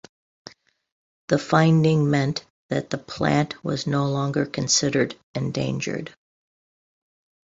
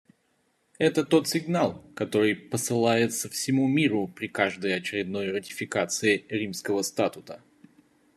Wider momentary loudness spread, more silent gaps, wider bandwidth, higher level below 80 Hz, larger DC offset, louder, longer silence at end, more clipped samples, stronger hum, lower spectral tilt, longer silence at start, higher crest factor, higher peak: first, 11 LU vs 8 LU; first, 2.50-2.69 s, 5.23-5.34 s vs none; second, 7.8 kHz vs 14 kHz; first, -58 dBFS vs -70 dBFS; neither; first, -23 LUFS vs -26 LUFS; first, 1.35 s vs 0.8 s; neither; neither; about the same, -5 dB/octave vs -4.5 dB/octave; first, 1.3 s vs 0.8 s; about the same, 22 dB vs 20 dB; first, -2 dBFS vs -8 dBFS